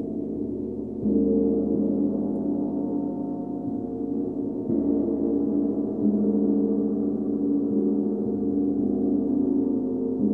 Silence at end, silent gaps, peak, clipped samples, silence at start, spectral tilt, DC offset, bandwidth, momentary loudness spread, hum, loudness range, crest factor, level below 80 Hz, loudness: 0 s; none; -12 dBFS; under 0.1%; 0 s; -13 dB/octave; 0.1%; 1.6 kHz; 7 LU; none; 3 LU; 12 dB; -52 dBFS; -25 LUFS